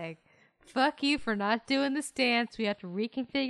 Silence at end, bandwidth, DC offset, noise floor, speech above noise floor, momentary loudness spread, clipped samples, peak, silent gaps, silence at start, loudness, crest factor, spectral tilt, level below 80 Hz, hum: 0 s; 12 kHz; under 0.1%; -64 dBFS; 34 dB; 8 LU; under 0.1%; -14 dBFS; none; 0 s; -30 LUFS; 18 dB; -4 dB/octave; -66 dBFS; none